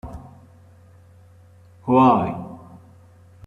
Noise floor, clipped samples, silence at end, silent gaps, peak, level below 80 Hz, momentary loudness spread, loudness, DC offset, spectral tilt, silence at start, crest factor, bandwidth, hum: -49 dBFS; under 0.1%; 0.9 s; none; -4 dBFS; -52 dBFS; 26 LU; -18 LUFS; under 0.1%; -9 dB/octave; 0.05 s; 20 dB; 6.6 kHz; none